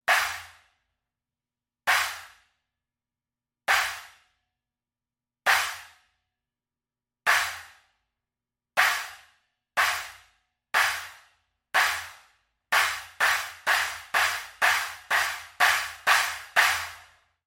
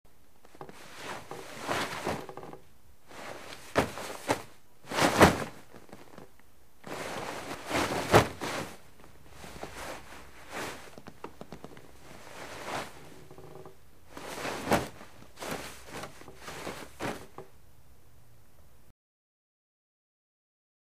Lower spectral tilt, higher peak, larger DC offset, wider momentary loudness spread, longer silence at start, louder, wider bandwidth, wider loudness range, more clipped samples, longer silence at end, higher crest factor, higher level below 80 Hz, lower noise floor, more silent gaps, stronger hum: second, 1.5 dB/octave vs -4 dB/octave; second, -6 dBFS vs -2 dBFS; second, under 0.1% vs 0.4%; second, 12 LU vs 24 LU; second, 0.1 s vs 0.6 s; first, -25 LUFS vs -32 LUFS; about the same, 16.5 kHz vs 15.5 kHz; second, 8 LU vs 15 LU; neither; second, 0.45 s vs 3.4 s; second, 22 dB vs 32 dB; second, -68 dBFS vs -54 dBFS; first, under -90 dBFS vs -62 dBFS; neither; neither